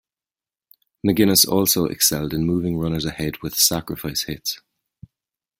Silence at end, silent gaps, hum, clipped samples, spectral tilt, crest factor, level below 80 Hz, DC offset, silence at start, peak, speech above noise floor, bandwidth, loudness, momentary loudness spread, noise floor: 1.05 s; none; none; under 0.1%; -3.5 dB/octave; 22 dB; -48 dBFS; under 0.1%; 1.05 s; 0 dBFS; over 70 dB; 16.5 kHz; -19 LUFS; 12 LU; under -90 dBFS